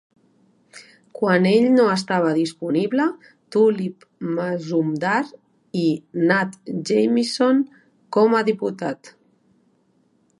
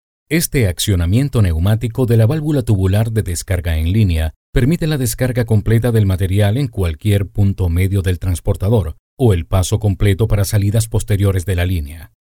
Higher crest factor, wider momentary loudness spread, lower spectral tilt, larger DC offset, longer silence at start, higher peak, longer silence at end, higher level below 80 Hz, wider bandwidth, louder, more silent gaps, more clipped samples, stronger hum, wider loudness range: first, 18 dB vs 12 dB; first, 13 LU vs 5 LU; about the same, -6 dB/octave vs -6.5 dB/octave; neither; first, 0.75 s vs 0.3 s; about the same, -4 dBFS vs -2 dBFS; first, 1.3 s vs 0.2 s; second, -72 dBFS vs -28 dBFS; second, 11.5 kHz vs 17.5 kHz; second, -20 LUFS vs -16 LUFS; second, none vs 4.36-4.53 s, 8.99-9.17 s; neither; neither; about the same, 3 LU vs 1 LU